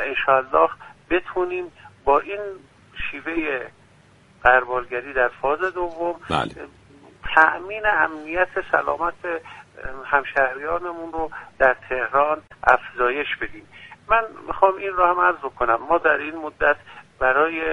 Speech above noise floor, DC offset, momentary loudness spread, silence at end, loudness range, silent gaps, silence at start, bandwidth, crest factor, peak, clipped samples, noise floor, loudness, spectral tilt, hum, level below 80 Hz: 32 dB; under 0.1%; 14 LU; 0 s; 3 LU; none; 0 s; 10.5 kHz; 22 dB; 0 dBFS; under 0.1%; -53 dBFS; -21 LUFS; -5.5 dB/octave; none; -46 dBFS